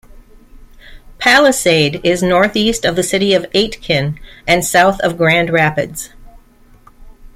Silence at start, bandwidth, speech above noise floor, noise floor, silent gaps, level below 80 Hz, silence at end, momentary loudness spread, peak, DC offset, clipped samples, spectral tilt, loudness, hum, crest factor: 0.15 s; 16.5 kHz; 32 dB; -45 dBFS; none; -38 dBFS; 0.05 s; 11 LU; 0 dBFS; under 0.1%; under 0.1%; -4 dB/octave; -13 LUFS; none; 14 dB